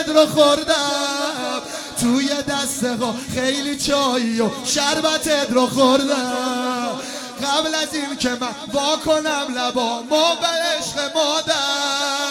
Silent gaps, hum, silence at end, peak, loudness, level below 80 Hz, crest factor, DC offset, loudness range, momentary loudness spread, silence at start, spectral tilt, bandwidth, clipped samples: none; none; 0 s; -2 dBFS; -19 LUFS; -52 dBFS; 18 dB; under 0.1%; 3 LU; 8 LU; 0 s; -2.5 dB/octave; 17.5 kHz; under 0.1%